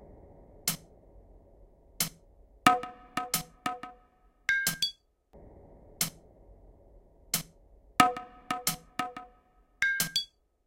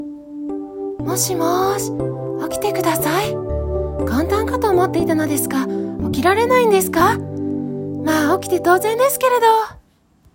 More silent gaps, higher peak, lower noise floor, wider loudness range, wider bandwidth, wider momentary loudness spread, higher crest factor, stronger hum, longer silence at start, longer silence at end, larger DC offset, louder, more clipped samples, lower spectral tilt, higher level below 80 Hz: neither; about the same, -2 dBFS vs -2 dBFS; first, -64 dBFS vs -54 dBFS; about the same, 3 LU vs 4 LU; about the same, 16.5 kHz vs 17 kHz; first, 15 LU vs 11 LU; first, 32 dB vs 16 dB; neither; about the same, 0 s vs 0 s; second, 0.4 s vs 0.55 s; neither; second, -31 LUFS vs -18 LUFS; neither; second, -1.5 dB/octave vs -4.5 dB/octave; second, -60 dBFS vs -36 dBFS